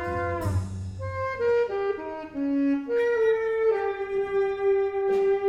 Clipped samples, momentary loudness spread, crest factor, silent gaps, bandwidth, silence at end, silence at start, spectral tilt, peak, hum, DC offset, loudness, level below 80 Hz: under 0.1%; 8 LU; 12 dB; none; 12 kHz; 0 s; 0 s; -8 dB/octave; -14 dBFS; none; under 0.1%; -26 LUFS; -50 dBFS